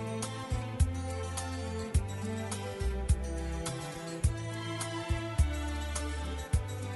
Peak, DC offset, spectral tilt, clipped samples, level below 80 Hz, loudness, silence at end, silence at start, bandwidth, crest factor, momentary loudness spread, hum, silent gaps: -16 dBFS; under 0.1%; -5 dB/octave; under 0.1%; -38 dBFS; -35 LUFS; 0 s; 0 s; 11.5 kHz; 18 dB; 5 LU; none; none